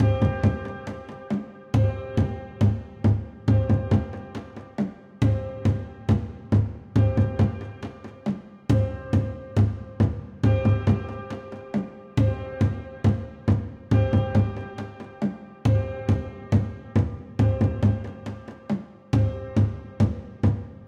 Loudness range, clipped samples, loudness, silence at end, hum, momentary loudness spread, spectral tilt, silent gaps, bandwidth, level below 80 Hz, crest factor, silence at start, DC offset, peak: 1 LU; under 0.1%; -25 LUFS; 0 s; none; 13 LU; -9 dB/octave; none; 7 kHz; -38 dBFS; 16 dB; 0 s; under 0.1%; -8 dBFS